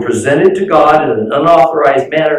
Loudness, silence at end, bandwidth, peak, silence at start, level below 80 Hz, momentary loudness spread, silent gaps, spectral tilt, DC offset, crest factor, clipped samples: -9 LUFS; 0 s; 12 kHz; 0 dBFS; 0 s; -48 dBFS; 4 LU; none; -5.5 dB/octave; under 0.1%; 10 dB; under 0.1%